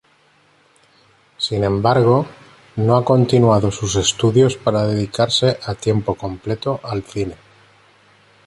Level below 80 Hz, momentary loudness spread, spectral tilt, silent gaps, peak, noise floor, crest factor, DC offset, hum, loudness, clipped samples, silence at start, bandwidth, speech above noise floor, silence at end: -44 dBFS; 12 LU; -5.5 dB/octave; none; -2 dBFS; -56 dBFS; 16 dB; under 0.1%; none; -17 LUFS; under 0.1%; 1.4 s; 11.5 kHz; 39 dB; 1.1 s